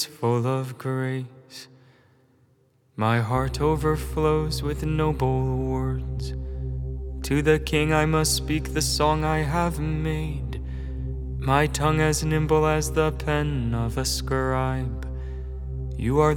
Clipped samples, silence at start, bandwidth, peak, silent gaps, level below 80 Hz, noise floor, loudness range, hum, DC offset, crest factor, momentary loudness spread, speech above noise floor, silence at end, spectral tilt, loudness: under 0.1%; 0 s; 18.5 kHz; -6 dBFS; none; -34 dBFS; -62 dBFS; 4 LU; none; under 0.1%; 18 dB; 12 LU; 39 dB; 0 s; -5.5 dB/octave; -25 LUFS